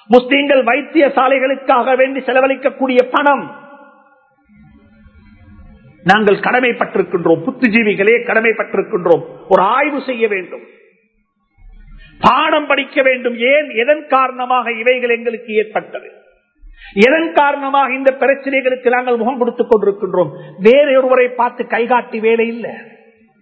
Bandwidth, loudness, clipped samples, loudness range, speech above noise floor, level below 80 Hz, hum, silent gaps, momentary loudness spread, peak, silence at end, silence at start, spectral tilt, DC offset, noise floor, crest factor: 8 kHz; -13 LUFS; 0.2%; 4 LU; 49 dB; -50 dBFS; none; none; 7 LU; 0 dBFS; 0.6 s; 0.1 s; -6.5 dB/octave; under 0.1%; -62 dBFS; 14 dB